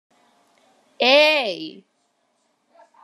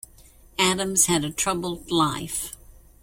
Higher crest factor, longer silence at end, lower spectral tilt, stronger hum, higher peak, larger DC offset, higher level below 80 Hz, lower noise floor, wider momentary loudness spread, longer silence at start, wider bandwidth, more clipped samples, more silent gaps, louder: about the same, 22 dB vs 22 dB; first, 1.35 s vs 0.3 s; about the same, -2 dB/octave vs -2.5 dB/octave; neither; about the same, -2 dBFS vs -4 dBFS; neither; second, under -90 dBFS vs -50 dBFS; first, -68 dBFS vs -51 dBFS; first, 19 LU vs 11 LU; first, 1 s vs 0.6 s; second, 13 kHz vs 16.5 kHz; neither; neither; first, -16 LUFS vs -23 LUFS